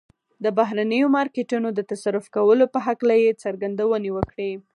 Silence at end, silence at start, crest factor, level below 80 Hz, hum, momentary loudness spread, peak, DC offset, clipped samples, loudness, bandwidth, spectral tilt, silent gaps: 0.15 s; 0.4 s; 18 dB; -52 dBFS; none; 9 LU; -4 dBFS; under 0.1%; under 0.1%; -22 LUFS; 11.5 kHz; -6.5 dB/octave; none